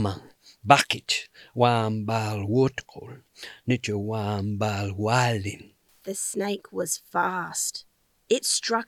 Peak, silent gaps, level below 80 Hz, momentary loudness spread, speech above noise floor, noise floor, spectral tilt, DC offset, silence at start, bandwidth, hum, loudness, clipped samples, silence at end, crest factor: 0 dBFS; none; -66 dBFS; 18 LU; 21 dB; -47 dBFS; -4 dB/octave; under 0.1%; 0 s; 16.5 kHz; none; -25 LUFS; under 0.1%; 0.05 s; 26 dB